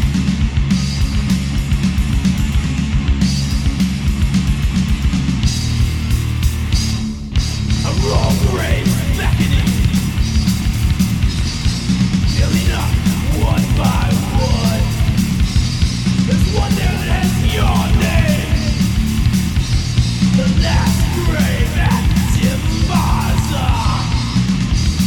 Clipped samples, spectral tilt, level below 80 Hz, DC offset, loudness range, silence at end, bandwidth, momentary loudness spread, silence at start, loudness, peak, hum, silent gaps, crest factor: under 0.1%; -5.5 dB/octave; -20 dBFS; under 0.1%; 2 LU; 0 s; 18.5 kHz; 3 LU; 0 s; -16 LUFS; -2 dBFS; none; none; 14 dB